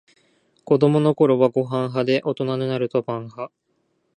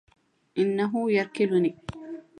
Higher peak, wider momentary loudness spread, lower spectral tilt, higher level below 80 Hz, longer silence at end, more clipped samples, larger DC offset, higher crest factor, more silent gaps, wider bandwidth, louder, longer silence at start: first, -4 dBFS vs -12 dBFS; about the same, 13 LU vs 15 LU; first, -8.5 dB/octave vs -7 dB/octave; second, -68 dBFS vs -60 dBFS; first, 0.7 s vs 0.2 s; neither; neither; about the same, 18 dB vs 16 dB; neither; about the same, 10 kHz vs 10.5 kHz; first, -20 LUFS vs -26 LUFS; about the same, 0.65 s vs 0.55 s